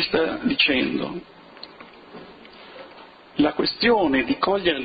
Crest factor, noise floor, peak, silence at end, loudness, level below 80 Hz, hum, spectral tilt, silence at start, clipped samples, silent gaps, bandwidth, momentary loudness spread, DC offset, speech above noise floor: 18 dB; -46 dBFS; -6 dBFS; 0 s; -21 LUFS; -52 dBFS; none; -8 dB/octave; 0 s; under 0.1%; none; 5 kHz; 24 LU; under 0.1%; 24 dB